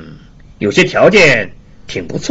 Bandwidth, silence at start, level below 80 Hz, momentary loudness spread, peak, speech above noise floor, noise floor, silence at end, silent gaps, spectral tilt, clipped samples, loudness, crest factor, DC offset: 8 kHz; 0 s; -40 dBFS; 18 LU; 0 dBFS; 26 dB; -37 dBFS; 0 s; none; -4.5 dB/octave; under 0.1%; -10 LUFS; 14 dB; under 0.1%